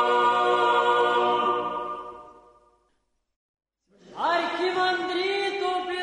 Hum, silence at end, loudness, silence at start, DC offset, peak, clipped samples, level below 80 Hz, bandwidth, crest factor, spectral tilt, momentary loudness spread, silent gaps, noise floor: none; 0 s; -24 LUFS; 0 s; under 0.1%; -12 dBFS; under 0.1%; -68 dBFS; 10.5 kHz; 14 dB; -3.5 dB/octave; 12 LU; 3.36-3.54 s; -72 dBFS